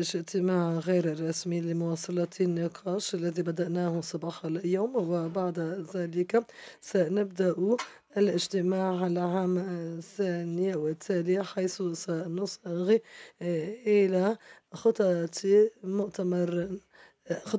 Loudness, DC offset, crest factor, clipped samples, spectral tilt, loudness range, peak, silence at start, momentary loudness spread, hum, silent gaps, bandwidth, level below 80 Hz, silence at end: -30 LUFS; under 0.1%; 16 dB; under 0.1%; -6 dB/octave; 4 LU; -14 dBFS; 0 s; 8 LU; none; none; 8 kHz; -74 dBFS; 0 s